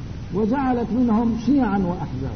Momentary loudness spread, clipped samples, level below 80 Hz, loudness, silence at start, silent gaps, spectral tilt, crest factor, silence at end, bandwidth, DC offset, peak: 6 LU; under 0.1%; -38 dBFS; -21 LUFS; 0 s; none; -8.5 dB/octave; 12 dB; 0 s; 6.4 kHz; 0.6%; -10 dBFS